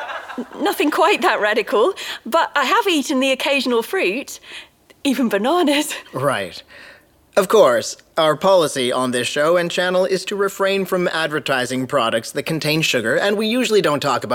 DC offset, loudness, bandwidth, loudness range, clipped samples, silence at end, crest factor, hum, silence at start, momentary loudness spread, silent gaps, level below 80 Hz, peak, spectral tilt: under 0.1%; -18 LUFS; 19 kHz; 3 LU; under 0.1%; 0 s; 18 dB; none; 0 s; 9 LU; none; -64 dBFS; -2 dBFS; -3.5 dB/octave